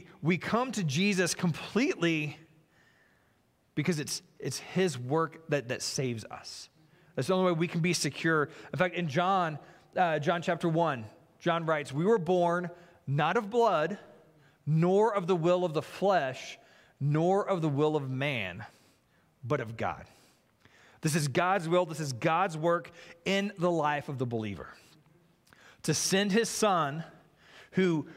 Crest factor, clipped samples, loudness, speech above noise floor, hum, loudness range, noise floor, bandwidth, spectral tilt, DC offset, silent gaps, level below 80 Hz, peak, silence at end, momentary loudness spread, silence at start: 20 dB; under 0.1%; -30 LUFS; 40 dB; none; 5 LU; -69 dBFS; 16 kHz; -5 dB/octave; under 0.1%; none; -70 dBFS; -10 dBFS; 0 s; 13 LU; 0 s